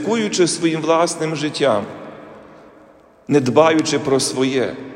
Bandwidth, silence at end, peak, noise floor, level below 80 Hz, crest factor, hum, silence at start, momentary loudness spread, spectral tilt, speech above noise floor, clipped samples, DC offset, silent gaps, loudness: 15.5 kHz; 0 s; 0 dBFS; -48 dBFS; -62 dBFS; 18 dB; none; 0 s; 8 LU; -4.5 dB/octave; 30 dB; under 0.1%; under 0.1%; none; -17 LUFS